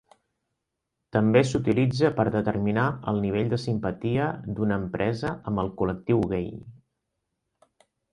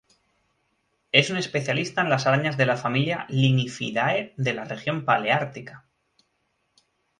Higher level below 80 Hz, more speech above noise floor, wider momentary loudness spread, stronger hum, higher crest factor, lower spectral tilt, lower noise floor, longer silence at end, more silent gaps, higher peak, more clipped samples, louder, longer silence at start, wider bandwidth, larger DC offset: first, -50 dBFS vs -66 dBFS; first, 57 dB vs 49 dB; about the same, 8 LU vs 7 LU; neither; about the same, 22 dB vs 24 dB; first, -7.5 dB/octave vs -5.5 dB/octave; first, -82 dBFS vs -73 dBFS; about the same, 1.35 s vs 1.4 s; neither; second, -6 dBFS vs -2 dBFS; neither; second, -26 LUFS vs -23 LUFS; about the same, 1.15 s vs 1.15 s; about the same, 10.5 kHz vs 10.5 kHz; neither